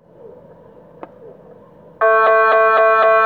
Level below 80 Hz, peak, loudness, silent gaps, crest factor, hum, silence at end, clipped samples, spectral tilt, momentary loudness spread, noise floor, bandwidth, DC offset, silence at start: -64 dBFS; -2 dBFS; -12 LUFS; none; 14 dB; none; 0 s; under 0.1%; -5 dB/octave; 3 LU; -43 dBFS; 4.7 kHz; under 0.1%; 0.25 s